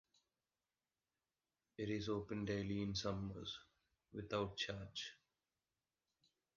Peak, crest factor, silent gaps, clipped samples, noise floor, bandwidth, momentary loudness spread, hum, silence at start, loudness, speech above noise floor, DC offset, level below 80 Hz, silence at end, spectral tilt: -28 dBFS; 20 dB; none; under 0.1%; under -90 dBFS; 7.2 kHz; 11 LU; none; 1.8 s; -45 LUFS; over 46 dB; under 0.1%; -66 dBFS; 1.4 s; -4.5 dB/octave